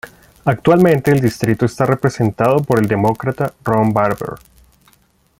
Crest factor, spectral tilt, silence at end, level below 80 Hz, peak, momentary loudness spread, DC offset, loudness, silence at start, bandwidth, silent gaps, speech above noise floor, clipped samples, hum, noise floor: 14 dB; -7.5 dB/octave; 1.05 s; -46 dBFS; -2 dBFS; 9 LU; under 0.1%; -15 LUFS; 0.05 s; 17 kHz; none; 41 dB; under 0.1%; none; -56 dBFS